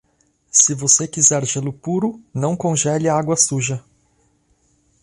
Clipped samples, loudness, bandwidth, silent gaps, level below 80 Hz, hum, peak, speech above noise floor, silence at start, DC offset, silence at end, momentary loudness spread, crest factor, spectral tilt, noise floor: under 0.1%; -17 LUFS; 11.5 kHz; none; -58 dBFS; none; 0 dBFS; 44 dB; 0.55 s; under 0.1%; 1.25 s; 11 LU; 20 dB; -3.5 dB/octave; -62 dBFS